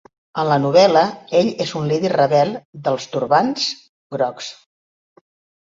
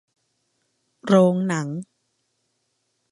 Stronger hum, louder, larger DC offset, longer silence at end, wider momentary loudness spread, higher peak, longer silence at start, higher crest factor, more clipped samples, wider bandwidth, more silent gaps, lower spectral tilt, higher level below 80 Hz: neither; about the same, -18 LUFS vs -20 LUFS; neither; second, 1.1 s vs 1.3 s; second, 15 LU vs 18 LU; about the same, -2 dBFS vs -4 dBFS; second, 0.35 s vs 1.05 s; about the same, 18 dB vs 22 dB; neither; second, 7.8 kHz vs 11 kHz; first, 2.65-2.73 s, 3.89-4.10 s vs none; second, -5.5 dB/octave vs -7 dB/octave; first, -62 dBFS vs -72 dBFS